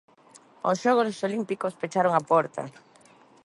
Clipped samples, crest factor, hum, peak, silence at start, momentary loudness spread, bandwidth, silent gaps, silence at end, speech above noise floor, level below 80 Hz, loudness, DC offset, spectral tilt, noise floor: under 0.1%; 20 dB; none; -8 dBFS; 0.65 s; 10 LU; 11.5 kHz; none; 0.75 s; 31 dB; -74 dBFS; -25 LUFS; under 0.1%; -5.5 dB/octave; -56 dBFS